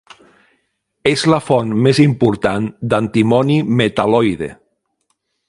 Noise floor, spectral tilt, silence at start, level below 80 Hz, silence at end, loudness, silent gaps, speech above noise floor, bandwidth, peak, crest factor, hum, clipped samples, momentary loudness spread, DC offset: -68 dBFS; -6.5 dB/octave; 1.05 s; -48 dBFS; 0.95 s; -15 LUFS; none; 54 dB; 11.5 kHz; 0 dBFS; 16 dB; none; under 0.1%; 7 LU; under 0.1%